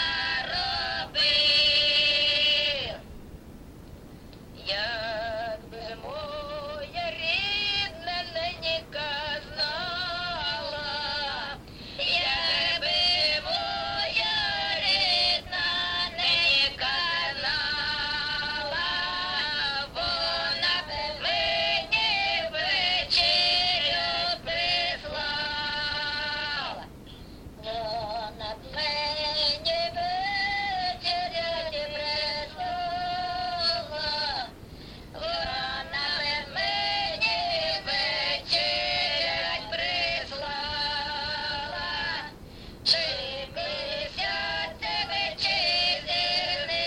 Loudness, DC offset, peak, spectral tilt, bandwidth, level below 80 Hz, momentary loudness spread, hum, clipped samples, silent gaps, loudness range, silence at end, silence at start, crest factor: -26 LUFS; under 0.1%; -8 dBFS; -2.5 dB/octave; 16.5 kHz; -50 dBFS; 13 LU; none; under 0.1%; none; 7 LU; 0 s; 0 s; 20 dB